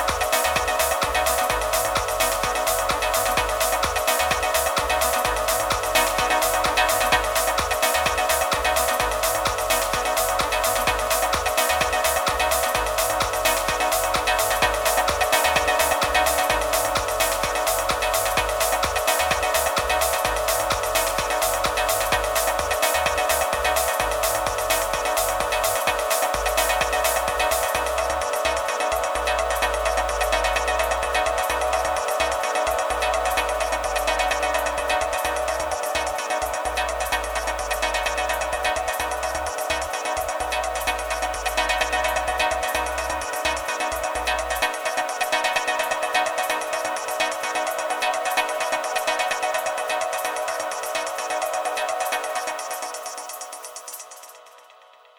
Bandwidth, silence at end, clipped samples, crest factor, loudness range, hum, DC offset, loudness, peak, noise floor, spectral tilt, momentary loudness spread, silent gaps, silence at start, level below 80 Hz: over 20 kHz; 0.6 s; under 0.1%; 14 dB; 4 LU; none; under 0.1%; -22 LUFS; -8 dBFS; -51 dBFS; -1.5 dB/octave; 5 LU; none; 0 s; -40 dBFS